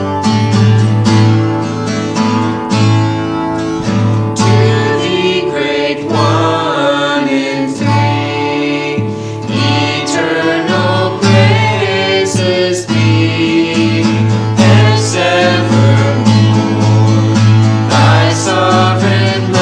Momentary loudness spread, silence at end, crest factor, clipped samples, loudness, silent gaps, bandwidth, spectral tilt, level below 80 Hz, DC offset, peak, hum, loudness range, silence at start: 6 LU; 0 s; 10 dB; 0.2%; -11 LUFS; none; 10 kHz; -6 dB/octave; -46 dBFS; under 0.1%; 0 dBFS; none; 4 LU; 0 s